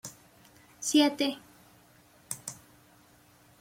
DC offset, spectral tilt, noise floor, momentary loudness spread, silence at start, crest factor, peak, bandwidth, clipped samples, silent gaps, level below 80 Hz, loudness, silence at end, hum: under 0.1%; -2.5 dB/octave; -60 dBFS; 21 LU; 0.05 s; 22 dB; -12 dBFS; 16.5 kHz; under 0.1%; none; -74 dBFS; -29 LUFS; 1.05 s; none